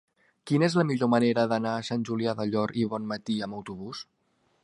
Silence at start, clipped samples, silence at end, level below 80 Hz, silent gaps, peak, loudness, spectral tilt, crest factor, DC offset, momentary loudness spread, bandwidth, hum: 0.45 s; under 0.1%; 0.6 s; -68 dBFS; none; -8 dBFS; -27 LUFS; -6.5 dB/octave; 20 dB; under 0.1%; 15 LU; 11.5 kHz; none